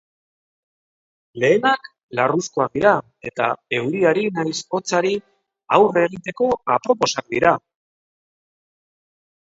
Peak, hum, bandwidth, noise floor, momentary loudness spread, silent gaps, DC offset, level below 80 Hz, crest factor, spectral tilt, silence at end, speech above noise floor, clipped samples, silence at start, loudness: 0 dBFS; none; 8 kHz; under -90 dBFS; 8 LU; 2.03-2.09 s; under 0.1%; -60 dBFS; 20 dB; -4.5 dB/octave; 1.95 s; over 71 dB; under 0.1%; 1.35 s; -20 LUFS